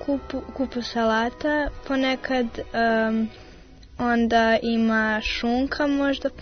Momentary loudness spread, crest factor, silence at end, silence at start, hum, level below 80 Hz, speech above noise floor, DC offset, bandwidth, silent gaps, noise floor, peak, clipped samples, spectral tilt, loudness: 8 LU; 14 dB; 0 s; 0 s; none; -44 dBFS; 22 dB; under 0.1%; 6.6 kHz; none; -46 dBFS; -10 dBFS; under 0.1%; -5 dB/octave; -23 LUFS